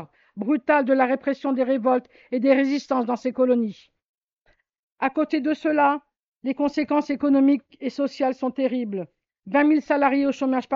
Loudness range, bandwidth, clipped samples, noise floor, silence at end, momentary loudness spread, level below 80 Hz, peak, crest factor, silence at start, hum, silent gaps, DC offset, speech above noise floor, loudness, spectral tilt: 3 LU; 7.2 kHz; under 0.1%; -66 dBFS; 0 s; 11 LU; -68 dBFS; -6 dBFS; 16 dB; 0 s; none; 4.03-4.15 s, 4.22-4.45 s, 4.79-4.96 s, 6.25-6.36 s; under 0.1%; 44 dB; -23 LUFS; -6.5 dB/octave